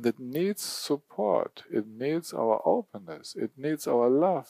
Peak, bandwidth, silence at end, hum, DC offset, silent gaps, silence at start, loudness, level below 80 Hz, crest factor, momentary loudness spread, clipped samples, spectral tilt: -10 dBFS; 15.5 kHz; 0.05 s; none; under 0.1%; none; 0 s; -29 LUFS; -84 dBFS; 18 dB; 11 LU; under 0.1%; -5 dB/octave